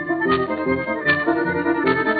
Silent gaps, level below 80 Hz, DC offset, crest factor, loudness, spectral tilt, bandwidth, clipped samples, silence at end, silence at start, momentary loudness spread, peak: none; -54 dBFS; under 0.1%; 16 dB; -20 LUFS; -4 dB/octave; 4.8 kHz; under 0.1%; 0 s; 0 s; 3 LU; -4 dBFS